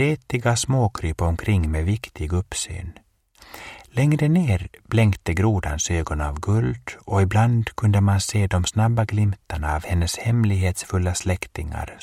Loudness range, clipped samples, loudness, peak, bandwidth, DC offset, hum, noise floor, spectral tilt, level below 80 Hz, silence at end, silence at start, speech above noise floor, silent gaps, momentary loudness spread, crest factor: 3 LU; under 0.1%; -22 LUFS; -6 dBFS; 14.5 kHz; under 0.1%; none; -51 dBFS; -5.5 dB/octave; -34 dBFS; 0.05 s; 0 s; 30 dB; none; 9 LU; 16 dB